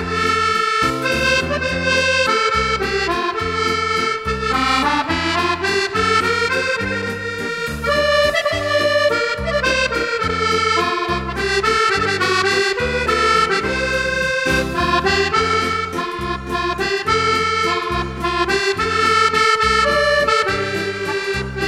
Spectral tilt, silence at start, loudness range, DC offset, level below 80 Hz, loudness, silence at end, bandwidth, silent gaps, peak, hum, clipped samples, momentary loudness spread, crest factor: -3.5 dB/octave; 0 s; 2 LU; under 0.1%; -36 dBFS; -17 LUFS; 0 s; 16 kHz; none; -2 dBFS; none; under 0.1%; 7 LU; 16 dB